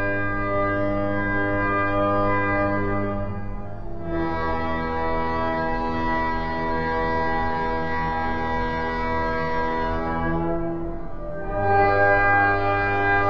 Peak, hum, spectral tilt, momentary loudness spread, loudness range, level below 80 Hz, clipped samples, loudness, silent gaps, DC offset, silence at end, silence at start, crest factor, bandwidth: -6 dBFS; none; -8 dB/octave; 11 LU; 4 LU; -36 dBFS; under 0.1%; -23 LUFS; none; 3%; 0 s; 0 s; 16 dB; 6.8 kHz